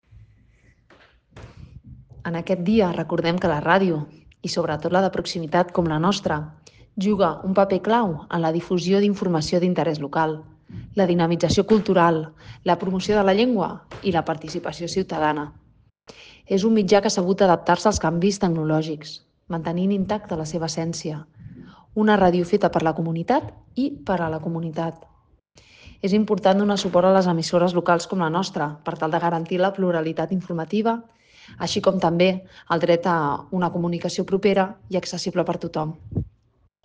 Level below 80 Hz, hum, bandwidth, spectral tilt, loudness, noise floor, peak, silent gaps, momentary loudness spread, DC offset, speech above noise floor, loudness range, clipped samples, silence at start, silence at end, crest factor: -50 dBFS; none; 9.6 kHz; -6 dB/octave; -22 LUFS; -63 dBFS; -4 dBFS; none; 11 LU; under 0.1%; 42 dB; 4 LU; under 0.1%; 1.35 s; 0.55 s; 18 dB